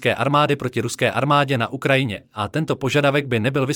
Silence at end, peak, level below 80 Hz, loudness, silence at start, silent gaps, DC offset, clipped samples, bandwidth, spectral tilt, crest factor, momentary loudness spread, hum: 0 s; -4 dBFS; -58 dBFS; -20 LUFS; 0 s; none; under 0.1%; under 0.1%; 17 kHz; -5.5 dB/octave; 16 dB; 7 LU; none